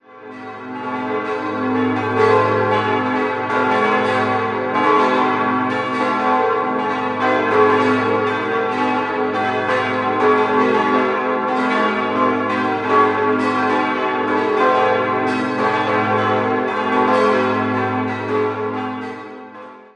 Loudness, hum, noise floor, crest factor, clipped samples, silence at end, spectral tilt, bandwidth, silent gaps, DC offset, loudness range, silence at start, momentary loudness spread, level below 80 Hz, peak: -17 LUFS; none; -37 dBFS; 16 dB; under 0.1%; 0.1 s; -6 dB/octave; 9.8 kHz; none; under 0.1%; 1 LU; 0.1 s; 8 LU; -60 dBFS; -2 dBFS